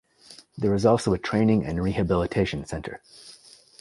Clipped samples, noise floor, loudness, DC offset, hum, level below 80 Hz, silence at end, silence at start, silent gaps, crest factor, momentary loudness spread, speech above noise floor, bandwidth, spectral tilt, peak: under 0.1%; -51 dBFS; -24 LUFS; under 0.1%; none; -44 dBFS; 0.5 s; 0.3 s; none; 20 dB; 23 LU; 27 dB; 11.5 kHz; -7 dB/octave; -6 dBFS